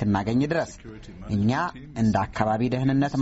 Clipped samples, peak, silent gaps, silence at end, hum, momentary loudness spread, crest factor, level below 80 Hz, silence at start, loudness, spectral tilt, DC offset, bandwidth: under 0.1%; -6 dBFS; none; 0 s; none; 13 LU; 18 dB; -46 dBFS; 0 s; -25 LUFS; -6.5 dB/octave; under 0.1%; 8 kHz